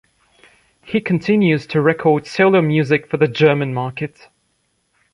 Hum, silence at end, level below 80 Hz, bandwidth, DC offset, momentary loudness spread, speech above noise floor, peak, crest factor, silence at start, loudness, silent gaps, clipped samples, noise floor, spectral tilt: none; 1.05 s; -58 dBFS; 10.5 kHz; under 0.1%; 9 LU; 50 dB; -2 dBFS; 16 dB; 0.85 s; -16 LUFS; none; under 0.1%; -66 dBFS; -7.5 dB/octave